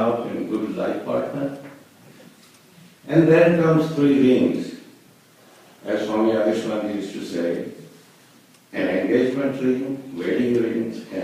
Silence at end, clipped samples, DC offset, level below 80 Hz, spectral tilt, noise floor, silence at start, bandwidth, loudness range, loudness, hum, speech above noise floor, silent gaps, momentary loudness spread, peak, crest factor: 0 s; under 0.1%; under 0.1%; -62 dBFS; -7.5 dB/octave; -52 dBFS; 0 s; 15 kHz; 6 LU; -21 LUFS; none; 33 dB; none; 14 LU; -4 dBFS; 18 dB